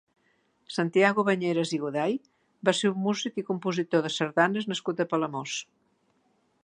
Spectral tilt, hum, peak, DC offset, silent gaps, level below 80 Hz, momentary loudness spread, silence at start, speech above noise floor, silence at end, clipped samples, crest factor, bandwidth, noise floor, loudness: -5 dB/octave; none; -6 dBFS; under 0.1%; none; -78 dBFS; 8 LU; 0.7 s; 43 dB; 1.05 s; under 0.1%; 22 dB; 10.5 kHz; -70 dBFS; -27 LUFS